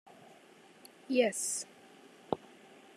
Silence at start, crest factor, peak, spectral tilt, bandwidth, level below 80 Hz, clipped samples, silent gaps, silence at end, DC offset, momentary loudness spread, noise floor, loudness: 1.1 s; 26 dB; -12 dBFS; -2.5 dB/octave; 13 kHz; -80 dBFS; under 0.1%; none; 0.6 s; under 0.1%; 27 LU; -59 dBFS; -34 LUFS